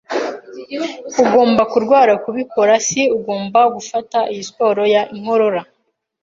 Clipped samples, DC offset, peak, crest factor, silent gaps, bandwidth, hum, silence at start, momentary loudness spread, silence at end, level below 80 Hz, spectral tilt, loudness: under 0.1%; under 0.1%; -2 dBFS; 14 dB; none; 7.6 kHz; none; 0.1 s; 12 LU; 0.6 s; -60 dBFS; -3.5 dB/octave; -16 LUFS